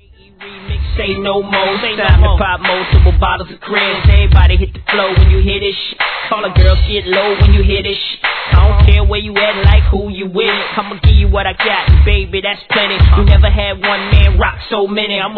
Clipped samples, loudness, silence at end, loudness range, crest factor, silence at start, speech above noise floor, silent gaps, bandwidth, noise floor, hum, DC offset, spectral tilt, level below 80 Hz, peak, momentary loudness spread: 0.5%; -12 LUFS; 0 s; 2 LU; 10 dB; 0.4 s; 26 dB; none; 4.6 kHz; -36 dBFS; none; 0.2%; -9 dB/octave; -12 dBFS; 0 dBFS; 8 LU